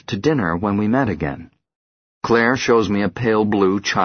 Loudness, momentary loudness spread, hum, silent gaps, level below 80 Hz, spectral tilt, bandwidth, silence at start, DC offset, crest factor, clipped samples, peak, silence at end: -18 LUFS; 9 LU; none; 1.75-2.21 s; -46 dBFS; -6 dB/octave; 6.6 kHz; 0.1 s; under 0.1%; 18 dB; under 0.1%; -2 dBFS; 0 s